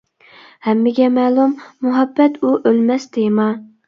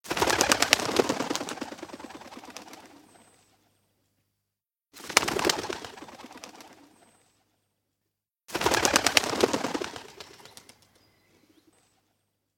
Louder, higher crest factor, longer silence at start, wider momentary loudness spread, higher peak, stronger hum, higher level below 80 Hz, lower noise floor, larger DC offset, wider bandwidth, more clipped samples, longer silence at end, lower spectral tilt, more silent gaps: first, -16 LUFS vs -25 LUFS; second, 16 dB vs 32 dB; first, 0.65 s vs 0.05 s; second, 5 LU vs 23 LU; about the same, 0 dBFS vs 0 dBFS; neither; second, -68 dBFS vs -58 dBFS; second, -45 dBFS vs -87 dBFS; neither; second, 7.2 kHz vs 17 kHz; neither; second, 0.2 s vs 2.3 s; first, -7 dB/octave vs -1.5 dB/octave; neither